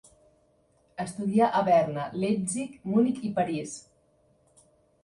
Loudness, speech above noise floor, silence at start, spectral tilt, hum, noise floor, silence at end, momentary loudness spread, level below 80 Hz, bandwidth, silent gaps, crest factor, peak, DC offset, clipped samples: -27 LUFS; 40 dB; 1 s; -6 dB/octave; none; -66 dBFS; 1.25 s; 14 LU; -66 dBFS; 11.5 kHz; none; 18 dB; -10 dBFS; under 0.1%; under 0.1%